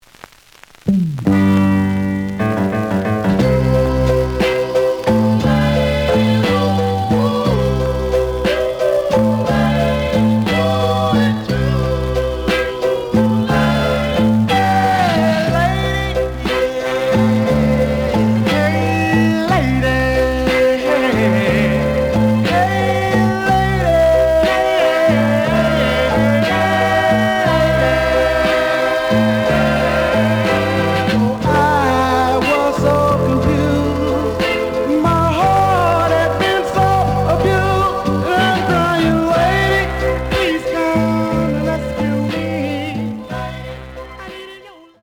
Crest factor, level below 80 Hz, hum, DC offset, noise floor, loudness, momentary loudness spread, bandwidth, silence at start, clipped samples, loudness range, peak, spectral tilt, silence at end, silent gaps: 12 dB; -30 dBFS; none; under 0.1%; -44 dBFS; -15 LUFS; 5 LU; 19.5 kHz; 0.85 s; under 0.1%; 2 LU; -2 dBFS; -6.5 dB/octave; 0.3 s; none